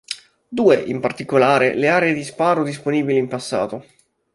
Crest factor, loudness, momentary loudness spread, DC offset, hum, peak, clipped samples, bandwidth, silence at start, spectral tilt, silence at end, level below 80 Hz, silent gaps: 18 dB; -18 LUFS; 12 LU; under 0.1%; none; -2 dBFS; under 0.1%; 11.5 kHz; 0.1 s; -5.5 dB/octave; 0.55 s; -60 dBFS; none